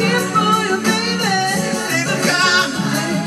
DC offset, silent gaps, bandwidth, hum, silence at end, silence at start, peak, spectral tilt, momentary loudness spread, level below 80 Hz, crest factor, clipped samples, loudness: under 0.1%; none; 15.5 kHz; none; 0 s; 0 s; -2 dBFS; -3.5 dB/octave; 5 LU; -56 dBFS; 14 dB; under 0.1%; -16 LUFS